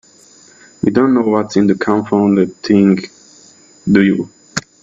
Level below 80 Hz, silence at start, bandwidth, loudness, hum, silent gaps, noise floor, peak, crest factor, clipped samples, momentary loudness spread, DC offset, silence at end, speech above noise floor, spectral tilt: -52 dBFS; 0.85 s; 7.6 kHz; -14 LUFS; none; none; -45 dBFS; 0 dBFS; 14 dB; under 0.1%; 12 LU; under 0.1%; 0.2 s; 33 dB; -6.5 dB/octave